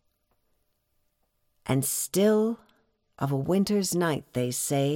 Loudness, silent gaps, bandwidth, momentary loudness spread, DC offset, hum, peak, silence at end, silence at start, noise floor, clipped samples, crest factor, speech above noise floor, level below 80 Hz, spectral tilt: -26 LUFS; none; 17.5 kHz; 8 LU; under 0.1%; none; -12 dBFS; 0 s; 1.65 s; -73 dBFS; under 0.1%; 16 dB; 48 dB; -62 dBFS; -5 dB/octave